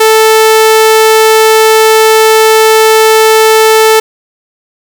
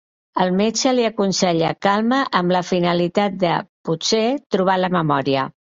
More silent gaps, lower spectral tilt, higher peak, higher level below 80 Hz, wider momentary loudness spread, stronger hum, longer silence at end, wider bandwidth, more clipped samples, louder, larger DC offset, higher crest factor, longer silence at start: second, none vs 3.69-3.84 s, 4.46-4.50 s; second, 1 dB/octave vs -4.5 dB/octave; about the same, 0 dBFS vs -2 dBFS; about the same, -56 dBFS vs -58 dBFS; second, 0 LU vs 4 LU; first, 60 Hz at -50 dBFS vs none; first, 1 s vs 0.25 s; first, over 20 kHz vs 7.8 kHz; neither; first, -5 LUFS vs -19 LUFS; neither; second, 6 dB vs 16 dB; second, 0 s vs 0.35 s